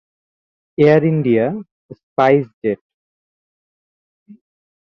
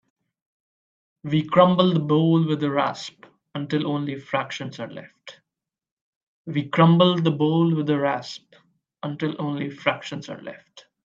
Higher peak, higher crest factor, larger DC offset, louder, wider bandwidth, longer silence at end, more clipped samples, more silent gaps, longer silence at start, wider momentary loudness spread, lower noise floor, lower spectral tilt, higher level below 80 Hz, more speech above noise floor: about the same, -2 dBFS vs -2 dBFS; about the same, 18 dB vs 22 dB; neither; first, -16 LUFS vs -22 LUFS; second, 6.4 kHz vs 7.4 kHz; first, 0.55 s vs 0.25 s; neither; first, 1.71-1.89 s, 2.03-2.16 s, 2.54-2.62 s, 2.81-4.26 s vs 5.91-6.45 s; second, 0.8 s vs 1.25 s; second, 16 LU vs 20 LU; about the same, under -90 dBFS vs -87 dBFS; first, -9 dB/octave vs -7.5 dB/octave; first, -60 dBFS vs -68 dBFS; first, over 75 dB vs 65 dB